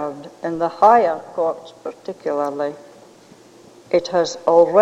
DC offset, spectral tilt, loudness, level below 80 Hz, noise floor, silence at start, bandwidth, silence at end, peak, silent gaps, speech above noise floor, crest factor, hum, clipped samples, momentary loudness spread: under 0.1%; -5 dB/octave; -19 LUFS; -66 dBFS; -47 dBFS; 0 s; 9.4 kHz; 0 s; -2 dBFS; none; 29 dB; 18 dB; none; under 0.1%; 18 LU